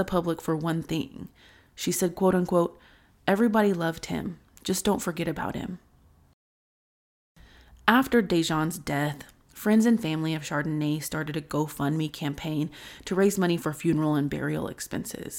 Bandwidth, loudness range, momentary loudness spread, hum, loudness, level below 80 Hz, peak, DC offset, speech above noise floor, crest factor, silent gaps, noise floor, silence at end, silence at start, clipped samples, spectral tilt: 17 kHz; 6 LU; 11 LU; none; -27 LUFS; -54 dBFS; -4 dBFS; under 0.1%; 33 dB; 24 dB; 6.34-7.35 s; -59 dBFS; 0 s; 0 s; under 0.1%; -5.5 dB/octave